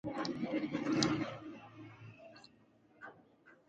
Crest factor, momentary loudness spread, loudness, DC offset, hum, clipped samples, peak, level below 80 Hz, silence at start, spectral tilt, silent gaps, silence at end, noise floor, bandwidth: 28 dB; 22 LU; -37 LUFS; under 0.1%; none; under 0.1%; -12 dBFS; -70 dBFS; 0.05 s; -4.5 dB/octave; none; 0.15 s; -67 dBFS; 9 kHz